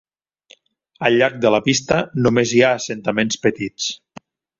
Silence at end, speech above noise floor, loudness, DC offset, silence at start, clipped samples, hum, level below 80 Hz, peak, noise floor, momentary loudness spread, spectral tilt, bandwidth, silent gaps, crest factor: 0.65 s; 35 dB; -18 LUFS; under 0.1%; 1 s; under 0.1%; none; -52 dBFS; -2 dBFS; -53 dBFS; 9 LU; -4.5 dB/octave; 7.8 kHz; none; 18 dB